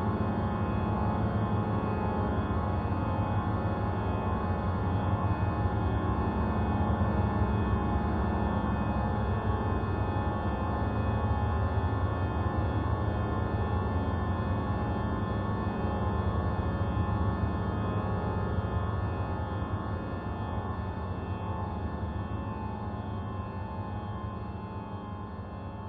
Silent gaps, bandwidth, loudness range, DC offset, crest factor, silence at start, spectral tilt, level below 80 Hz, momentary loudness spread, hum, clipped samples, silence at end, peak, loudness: none; 4.8 kHz; 6 LU; under 0.1%; 14 dB; 0 s; -10.5 dB/octave; -38 dBFS; 7 LU; none; under 0.1%; 0 s; -16 dBFS; -31 LUFS